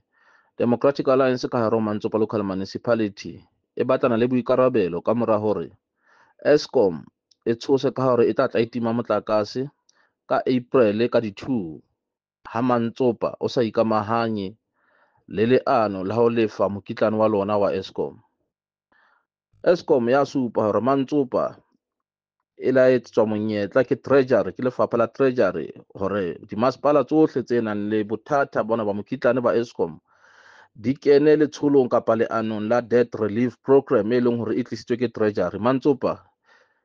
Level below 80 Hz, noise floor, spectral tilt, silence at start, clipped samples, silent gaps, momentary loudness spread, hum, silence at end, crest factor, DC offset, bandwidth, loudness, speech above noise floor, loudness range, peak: -64 dBFS; -87 dBFS; -7.5 dB/octave; 0.6 s; under 0.1%; none; 9 LU; none; 0.7 s; 18 dB; under 0.1%; 7.2 kHz; -22 LUFS; 65 dB; 3 LU; -4 dBFS